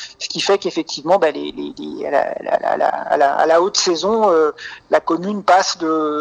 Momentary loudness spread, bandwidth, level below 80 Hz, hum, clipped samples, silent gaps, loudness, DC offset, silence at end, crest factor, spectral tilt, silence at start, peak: 11 LU; 9.2 kHz; -60 dBFS; none; under 0.1%; none; -17 LUFS; under 0.1%; 0 s; 16 dB; -3 dB/octave; 0 s; -2 dBFS